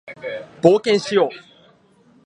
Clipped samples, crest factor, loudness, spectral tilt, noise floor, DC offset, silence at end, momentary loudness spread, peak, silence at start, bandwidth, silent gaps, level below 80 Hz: under 0.1%; 20 dB; -17 LUFS; -5.5 dB/octave; -54 dBFS; under 0.1%; 0.85 s; 15 LU; 0 dBFS; 0.05 s; 10 kHz; none; -66 dBFS